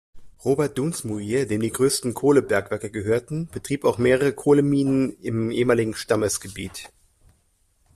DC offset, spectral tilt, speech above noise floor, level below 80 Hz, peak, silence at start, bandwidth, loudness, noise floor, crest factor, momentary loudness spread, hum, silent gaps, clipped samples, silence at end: under 0.1%; -5.5 dB/octave; 43 dB; -54 dBFS; -6 dBFS; 0.15 s; 14.5 kHz; -22 LUFS; -65 dBFS; 18 dB; 11 LU; none; none; under 0.1%; 1.1 s